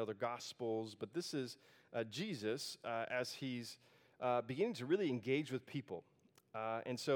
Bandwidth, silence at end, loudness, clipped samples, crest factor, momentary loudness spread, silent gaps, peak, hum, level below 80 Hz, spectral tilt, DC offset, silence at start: 18 kHz; 0 s; -42 LUFS; under 0.1%; 18 dB; 11 LU; none; -24 dBFS; none; under -90 dBFS; -5 dB/octave; under 0.1%; 0 s